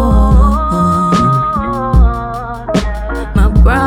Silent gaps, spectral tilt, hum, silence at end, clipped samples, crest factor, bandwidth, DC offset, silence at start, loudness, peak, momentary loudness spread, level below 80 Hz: none; -7.5 dB/octave; none; 0 s; under 0.1%; 8 dB; 10.5 kHz; under 0.1%; 0 s; -13 LUFS; -2 dBFS; 10 LU; -12 dBFS